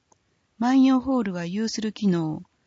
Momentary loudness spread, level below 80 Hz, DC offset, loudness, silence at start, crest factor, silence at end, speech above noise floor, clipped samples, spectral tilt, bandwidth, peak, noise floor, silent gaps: 9 LU; -60 dBFS; under 0.1%; -24 LUFS; 0.6 s; 14 dB; 0.25 s; 43 dB; under 0.1%; -6 dB/octave; 7.8 kHz; -10 dBFS; -66 dBFS; none